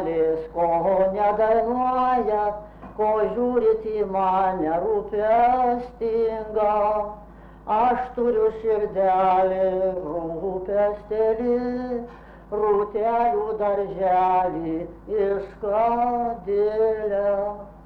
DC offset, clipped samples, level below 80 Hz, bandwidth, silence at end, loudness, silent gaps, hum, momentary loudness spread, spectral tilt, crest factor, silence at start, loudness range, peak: under 0.1%; under 0.1%; -48 dBFS; 5.2 kHz; 0 s; -23 LUFS; none; none; 9 LU; -8.5 dB/octave; 12 dB; 0 s; 2 LU; -12 dBFS